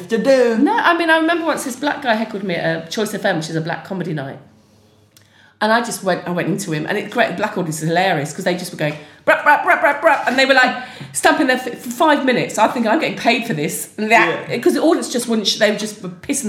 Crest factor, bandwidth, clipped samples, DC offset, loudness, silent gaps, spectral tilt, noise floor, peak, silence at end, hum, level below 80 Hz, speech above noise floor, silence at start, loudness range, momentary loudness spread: 18 dB; 17 kHz; under 0.1%; under 0.1%; -17 LUFS; none; -4 dB/octave; -52 dBFS; 0 dBFS; 0 s; none; -64 dBFS; 35 dB; 0 s; 7 LU; 10 LU